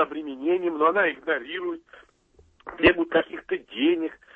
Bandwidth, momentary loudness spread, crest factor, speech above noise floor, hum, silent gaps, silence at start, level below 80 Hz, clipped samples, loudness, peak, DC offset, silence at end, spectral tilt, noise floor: 4.7 kHz; 13 LU; 20 dB; 35 dB; none; none; 0 s; -52 dBFS; under 0.1%; -24 LUFS; -4 dBFS; under 0.1%; 0.2 s; -7 dB/octave; -60 dBFS